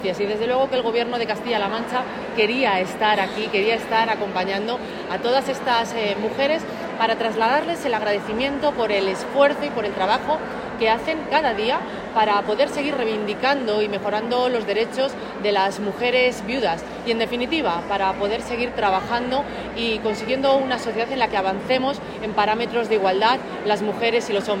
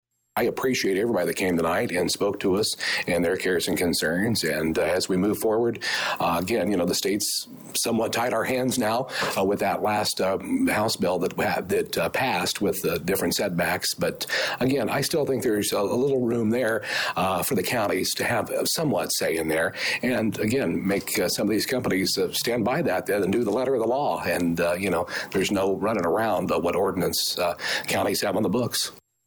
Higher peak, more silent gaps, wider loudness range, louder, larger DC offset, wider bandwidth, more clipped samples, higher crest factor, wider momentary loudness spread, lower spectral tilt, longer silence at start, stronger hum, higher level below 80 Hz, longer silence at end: first, -4 dBFS vs -14 dBFS; neither; about the same, 1 LU vs 1 LU; about the same, -22 LUFS vs -24 LUFS; neither; second, 16 kHz vs over 20 kHz; neither; first, 18 dB vs 10 dB; first, 6 LU vs 2 LU; about the same, -4.5 dB/octave vs -4 dB/octave; second, 0 s vs 0.35 s; neither; about the same, -52 dBFS vs -56 dBFS; second, 0 s vs 0.3 s